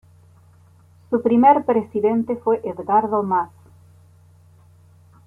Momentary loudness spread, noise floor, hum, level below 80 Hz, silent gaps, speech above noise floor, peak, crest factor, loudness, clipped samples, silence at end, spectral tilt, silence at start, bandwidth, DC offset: 9 LU; -51 dBFS; none; -64 dBFS; none; 33 dB; -2 dBFS; 18 dB; -19 LUFS; under 0.1%; 1.8 s; -9 dB/octave; 1.1 s; 3.4 kHz; under 0.1%